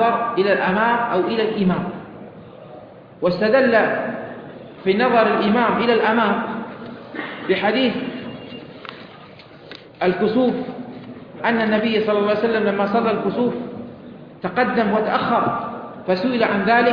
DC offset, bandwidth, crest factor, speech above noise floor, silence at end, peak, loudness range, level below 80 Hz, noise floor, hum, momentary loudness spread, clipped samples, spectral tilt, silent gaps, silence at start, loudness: under 0.1%; 5.4 kHz; 16 dB; 24 dB; 0 s; -4 dBFS; 6 LU; -56 dBFS; -42 dBFS; none; 20 LU; under 0.1%; -8.5 dB/octave; none; 0 s; -19 LUFS